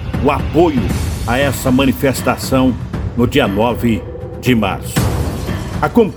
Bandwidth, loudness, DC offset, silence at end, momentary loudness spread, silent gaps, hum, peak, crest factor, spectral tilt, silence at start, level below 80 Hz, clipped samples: over 20 kHz; -15 LUFS; under 0.1%; 0 s; 7 LU; none; none; 0 dBFS; 14 dB; -6 dB/octave; 0 s; -26 dBFS; under 0.1%